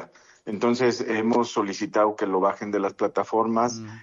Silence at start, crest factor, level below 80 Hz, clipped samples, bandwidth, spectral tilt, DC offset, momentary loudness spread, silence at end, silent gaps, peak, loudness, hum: 0 s; 16 dB; -70 dBFS; under 0.1%; 7.8 kHz; -5 dB/octave; under 0.1%; 5 LU; 0 s; none; -10 dBFS; -24 LUFS; none